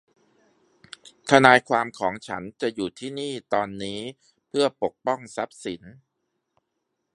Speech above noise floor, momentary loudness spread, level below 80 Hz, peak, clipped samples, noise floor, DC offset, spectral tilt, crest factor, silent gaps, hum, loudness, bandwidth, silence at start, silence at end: 55 dB; 19 LU; -64 dBFS; 0 dBFS; under 0.1%; -78 dBFS; under 0.1%; -4.5 dB/octave; 26 dB; none; none; -23 LUFS; 11.5 kHz; 1.25 s; 1.2 s